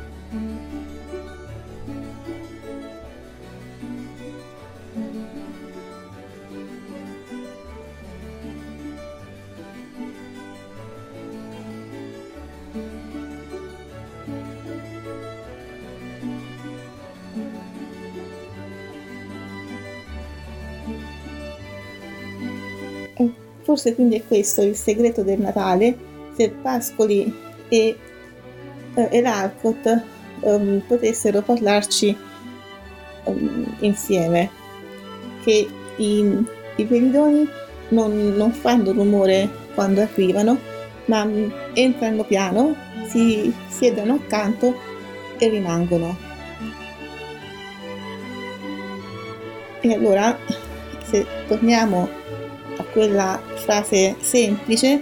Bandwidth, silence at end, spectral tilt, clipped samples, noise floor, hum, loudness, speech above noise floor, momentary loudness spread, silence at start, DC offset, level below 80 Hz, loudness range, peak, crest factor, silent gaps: 18 kHz; 0 s; -5 dB/octave; under 0.1%; -41 dBFS; none; -20 LUFS; 23 dB; 21 LU; 0 s; under 0.1%; -48 dBFS; 18 LU; -4 dBFS; 20 dB; none